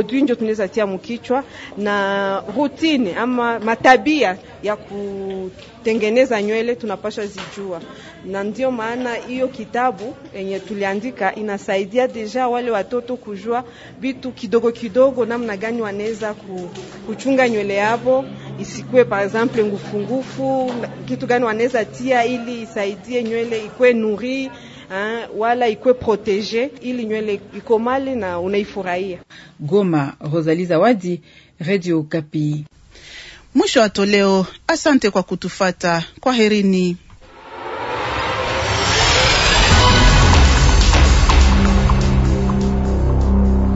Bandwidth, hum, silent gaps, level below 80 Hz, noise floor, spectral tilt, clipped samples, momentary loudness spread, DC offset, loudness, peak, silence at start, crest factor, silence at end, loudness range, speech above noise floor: 8 kHz; none; none; -24 dBFS; -40 dBFS; -5 dB/octave; under 0.1%; 15 LU; under 0.1%; -18 LUFS; 0 dBFS; 0 s; 18 dB; 0 s; 8 LU; 21 dB